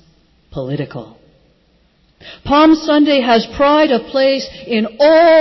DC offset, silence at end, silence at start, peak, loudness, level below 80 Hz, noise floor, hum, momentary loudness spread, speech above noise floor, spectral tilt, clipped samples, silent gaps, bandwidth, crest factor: under 0.1%; 0 s; 0.55 s; -2 dBFS; -13 LUFS; -44 dBFS; -55 dBFS; none; 17 LU; 43 dB; -6 dB/octave; under 0.1%; none; 6.2 kHz; 12 dB